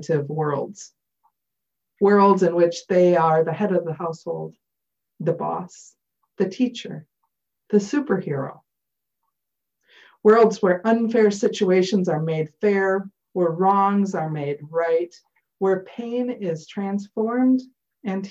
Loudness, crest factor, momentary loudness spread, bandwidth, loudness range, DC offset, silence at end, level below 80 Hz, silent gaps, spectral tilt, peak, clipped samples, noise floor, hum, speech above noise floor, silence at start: -21 LUFS; 18 dB; 14 LU; 8 kHz; 8 LU; under 0.1%; 0 s; -70 dBFS; none; -7 dB/octave; -4 dBFS; under 0.1%; -84 dBFS; none; 63 dB; 0 s